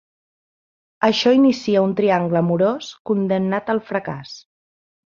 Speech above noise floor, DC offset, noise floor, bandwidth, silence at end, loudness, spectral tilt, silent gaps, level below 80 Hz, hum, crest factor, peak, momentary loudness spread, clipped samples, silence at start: over 72 dB; under 0.1%; under -90 dBFS; 7.4 kHz; 0.65 s; -19 LUFS; -6.5 dB/octave; 3.00-3.05 s; -62 dBFS; none; 18 dB; -2 dBFS; 14 LU; under 0.1%; 1 s